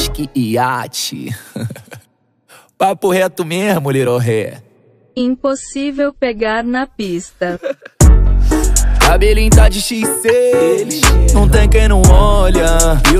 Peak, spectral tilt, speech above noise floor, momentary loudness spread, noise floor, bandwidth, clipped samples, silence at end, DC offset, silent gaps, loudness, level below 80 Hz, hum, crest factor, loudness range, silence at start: 0 dBFS; -5 dB/octave; 44 dB; 12 LU; -55 dBFS; 15.5 kHz; under 0.1%; 0 s; under 0.1%; none; -13 LUFS; -14 dBFS; none; 12 dB; 8 LU; 0 s